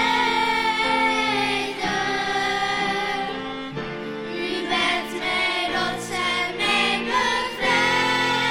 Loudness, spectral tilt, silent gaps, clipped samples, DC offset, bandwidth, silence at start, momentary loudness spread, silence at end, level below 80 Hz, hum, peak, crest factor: -22 LUFS; -3 dB/octave; none; under 0.1%; under 0.1%; 16 kHz; 0 s; 9 LU; 0 s; -52 dBFS; none; -6 dBFS; 16 dB